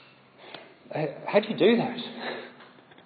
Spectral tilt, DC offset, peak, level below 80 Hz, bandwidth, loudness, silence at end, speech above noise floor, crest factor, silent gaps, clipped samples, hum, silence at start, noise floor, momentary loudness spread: -9.5 dB/octave; under 0.1%; -8 dBFS; -82 dBFS; 5 kHz; -27 LUFS; 0.4 s; 26 dB; 20 dB; none; under 0.1%; none; 0.4 s; -52 dBFS; 23 LU